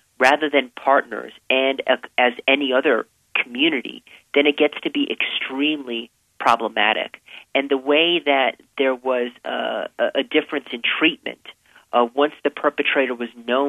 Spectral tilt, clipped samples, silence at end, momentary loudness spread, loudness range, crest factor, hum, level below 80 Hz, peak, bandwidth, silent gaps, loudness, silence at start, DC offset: -3.5 dB/octave; under 0.1%; 0 s; 10 LU; 2 LU; 20 dB; none; -72 dBFS; -2 dBFS; 13.5 kHz; none; -20 LUFS; 0.2 s; under 0.1%